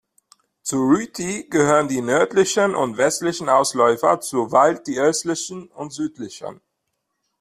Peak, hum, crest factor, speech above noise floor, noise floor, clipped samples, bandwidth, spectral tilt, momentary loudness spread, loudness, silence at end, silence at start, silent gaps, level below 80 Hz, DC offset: -2 dBFS; none; 18 dB; 56 dB; -76 dBFS; under 0.1%; 15 kHz; -4 dB/octave; 14 LU; -19 LUFS; 0.85 s; 0.65 s; none; -62 dBFS; under 0.1%